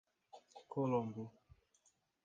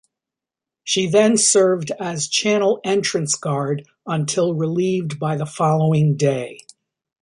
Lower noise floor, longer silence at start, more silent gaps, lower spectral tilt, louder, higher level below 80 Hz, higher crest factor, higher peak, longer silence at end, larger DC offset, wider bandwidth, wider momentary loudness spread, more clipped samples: second, -77 dBFS vs -87 dBFS; second, 0.35 s vs 0.85 s; neither; first, -8.5 dB/octave vs -4.5 dB/octave; second, -41 LUFS vs -19 LUFS; second, -78 dBFS vs -64 dBFS; about the same, 20 dB vs 16 dB; second, -24 dBFS vs -2 dBFS; first, 0.95 s vs 0.65 s; neither; second, 7.6 kHz vs 11.5 kHz; first, 22 LU vs 11 LU; neither